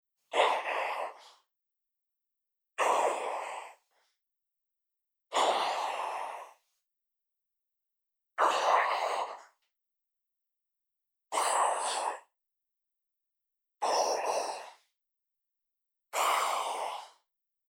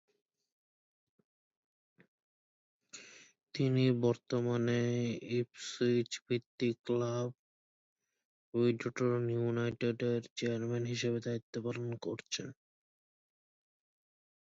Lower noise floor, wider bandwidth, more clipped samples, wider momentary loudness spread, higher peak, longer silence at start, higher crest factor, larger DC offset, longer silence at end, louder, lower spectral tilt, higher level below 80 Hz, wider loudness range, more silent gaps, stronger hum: first, -87 dBFS vs -55 dBFS; first, 18 kHz vs 8 kHz; neither; first, 16 LU vs 9 LU; first, -12 dBFS vs -18 dBFS; second, 0.3 s vs 2.95 s; about the same, 22 dB vs 20 dB; neither; second, 0.6 s vs 1.9 s; first, -31 LUFS vs -35 LUFS; second, 1 dB/octave vs -6 dB/octave; second, under -90 dBFS vs -76 dBFS; second, 3 LU vs 6 LU; second, none vs 6.22-6.26 s, 6.46-6.58 s, 6.79-6.84 s, 7.39-7.96 s, 8.25-8.52 s, 10.30-10.36 s, 11.42-11.53 s; neither